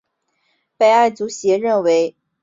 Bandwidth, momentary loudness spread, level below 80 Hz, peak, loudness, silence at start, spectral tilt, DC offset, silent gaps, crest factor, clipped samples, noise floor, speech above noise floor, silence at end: 7.8 kHz; 7 LU; -68 dBFS; -2 dBFS; -16 LUFS; 0.8 s; -4 dB/octave; under 0.1%; none; 14 dB; under 0.1%; -68 dBFS; 52 dB; 0.35 s